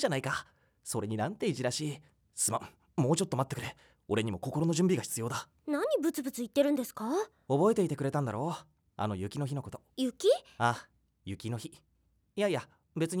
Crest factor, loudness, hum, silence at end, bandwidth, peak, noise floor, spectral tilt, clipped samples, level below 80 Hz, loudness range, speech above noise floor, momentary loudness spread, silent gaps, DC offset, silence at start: 18 dB; -33 LUFS; none; 0 s; over 20 kHz; -14 dBFS; -57 dBFS; -5 dB/octave; under 0.1%; -68 dBFS; 3 LU; 25 dB; 13 LU; none; under 0.1%; 0 s